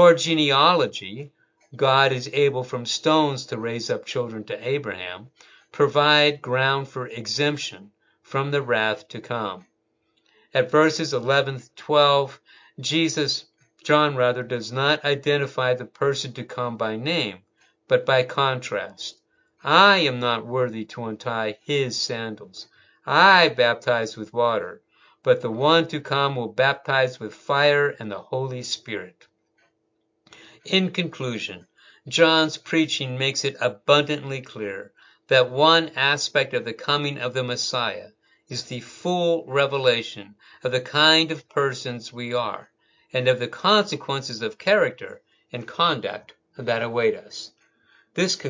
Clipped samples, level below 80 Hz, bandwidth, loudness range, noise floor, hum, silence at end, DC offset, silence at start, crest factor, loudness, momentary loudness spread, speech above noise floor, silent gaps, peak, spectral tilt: under 0.1%; -70 dBFS; 7.6 kHz; 5 LU; -72 dBFS; none; 0 s; under 0.1%; 0 s; 22 dB; -22 LUFS; 16 LU; 50 dB; none; 0 dBFS; -4 dB/octave